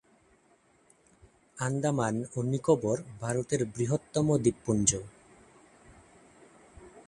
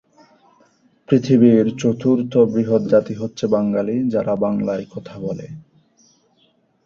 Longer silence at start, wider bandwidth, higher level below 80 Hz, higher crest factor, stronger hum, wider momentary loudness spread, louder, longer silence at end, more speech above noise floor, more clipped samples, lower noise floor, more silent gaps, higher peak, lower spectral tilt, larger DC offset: first, 1.55 s vs 1.1 s; first, 11.5 kHz vs 7.4 kHz; about the same, -58 dBFS vs -58 dBFS; first, 26 dB vs 18 dB; neither; second, 8 LU vs 15 LU; second, -29 LUFS vs -18 LUFS; second, 0.05 s vs 1.25 s; second, 36 dB vs 43 dB; neither; first, -65 dBFS vs -60 dBFS; neither; second, -6 dBFS vs -2 dBFS; second, -5.5 dB/octave vs -8 dB/octave; neither